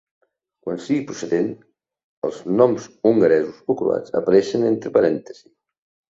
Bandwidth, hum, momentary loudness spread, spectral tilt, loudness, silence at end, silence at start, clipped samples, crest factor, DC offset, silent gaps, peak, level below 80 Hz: 7.8 kHz; none; 12 LU; -6.5 dB/octave; -20 LUFS; 0.8 s; 0.65 s; under 0.1%; 18 dB; under 0.1%; 2.04-2.22 s; -2 dBFS; -64 dBFS